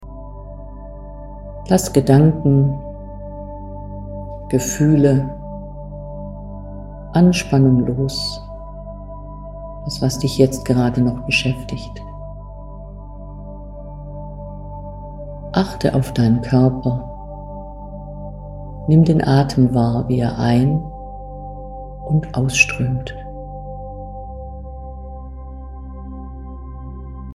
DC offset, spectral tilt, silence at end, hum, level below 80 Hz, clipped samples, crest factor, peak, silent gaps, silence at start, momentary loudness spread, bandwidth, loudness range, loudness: under 0.1%; -6.5 dB/octave; 0 s; 50 Hz at -45 dBFS; -34 dBFS; under 0.1%; 20 dB; 0 dBFS; none; 0 s; 20 LU; 15 kHz; 14 LU; -17 LUFS